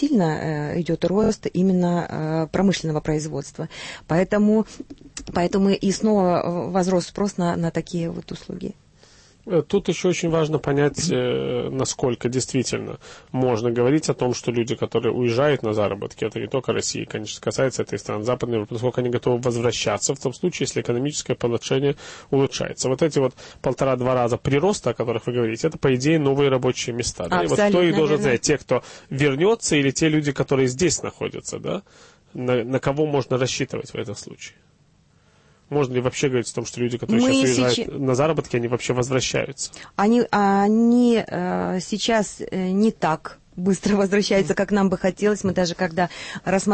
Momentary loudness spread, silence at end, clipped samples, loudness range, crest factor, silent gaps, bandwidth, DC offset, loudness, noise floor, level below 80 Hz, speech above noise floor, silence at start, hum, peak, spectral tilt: 10 LU; 0 s; under 0.1%; 5 LU; 14 dB; none; 8.8 kHz; under 0.1%; -22 LUFS; -58 dBFS; -50 dBFS; 37 dB; 0 s; none; -8 dBFS; -5 dB/octave